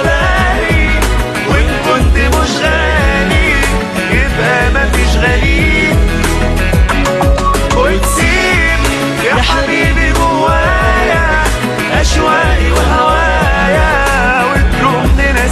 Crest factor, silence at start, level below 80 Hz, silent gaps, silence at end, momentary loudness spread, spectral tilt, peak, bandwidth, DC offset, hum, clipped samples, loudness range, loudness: 10 dB; 0 s; -14 dBFS; none; 0 s; 3 LU; -5 dB/octave; 0 dBFS; 14 kHz; under 0.1%; none; under 0.1%; 1 LU; -11 LUFS